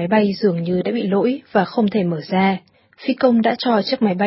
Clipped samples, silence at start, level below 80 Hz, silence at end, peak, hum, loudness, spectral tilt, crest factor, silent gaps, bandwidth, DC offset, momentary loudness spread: under 0.1%; 0 s; -60 dBFS; 0 s; -2 dBFS; none; -19 LUFS; -11 dB/octave; 16 dB; none; 5.8 kHz; under 0.1%; 5 LU